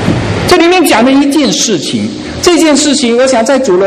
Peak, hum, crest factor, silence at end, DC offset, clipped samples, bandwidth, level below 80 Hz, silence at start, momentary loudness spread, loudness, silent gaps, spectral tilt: 0 dBFS; none; 8 dB; 0 s; under 0.1%; 0.5%; 15.5 kHz; -34 dBFS; 0 s; 6 LU; -8 LUFS; none; -4 dB/octave